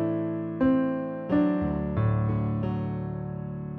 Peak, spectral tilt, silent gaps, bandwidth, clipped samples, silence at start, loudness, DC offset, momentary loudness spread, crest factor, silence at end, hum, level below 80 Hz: -12 dBFS; -11.5 dB/octave; none; 4.2 kHz; under 0.1%; 0 s; -28 LUFS; under 0.1%; 9 LU; 14 dB; 0 s; none; -46 dBFS